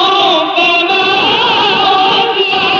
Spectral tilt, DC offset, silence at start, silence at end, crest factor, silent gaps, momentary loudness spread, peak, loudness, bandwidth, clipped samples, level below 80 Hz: -3.5 dB/octave; under 0.1%; 0 s; 0 s; 10 dB; none; 1 LU; 0 dBFS; -9 LUFS; 7.4 kHz; under 0.1%; -50 dBFS